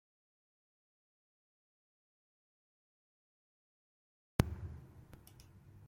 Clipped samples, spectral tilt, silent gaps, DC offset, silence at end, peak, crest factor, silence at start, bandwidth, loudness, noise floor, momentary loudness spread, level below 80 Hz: under 0.1%; -6.5 dB/octave; none; under 0.1%; 0 s; -12 dBFS; 36 dB; 4.4 s; 16.5 kHz; -40 LUFS; -60 dBFS; 23 LU; -56 dBFS